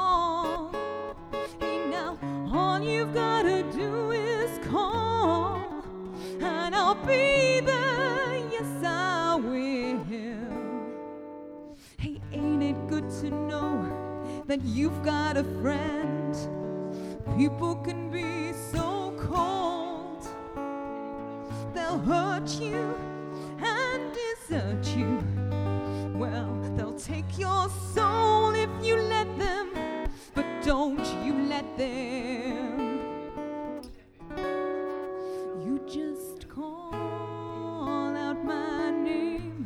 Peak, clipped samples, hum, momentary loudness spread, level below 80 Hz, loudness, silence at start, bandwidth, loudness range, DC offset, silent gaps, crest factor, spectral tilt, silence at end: -10 dBFS; under 0.1%; none; 12 LU; -48 dBFS; -30 LUFS; 0 s; 15 kHz; 8 LU; under 0.1%; none; 18 dB; -5.5 dB/octave; 0 s